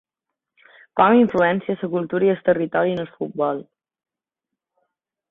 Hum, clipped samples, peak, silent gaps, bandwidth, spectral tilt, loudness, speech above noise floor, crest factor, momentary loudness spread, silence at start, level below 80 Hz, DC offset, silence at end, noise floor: none; under 0.1%; -2 dBFS; none; 4 kHz; -9 dB/octave; -20 LUFS; 66 dB; 20 dB; 12 LU; 0.95 s; -62 dBFS; under 0.1%; 1.7 s; -85 dBFS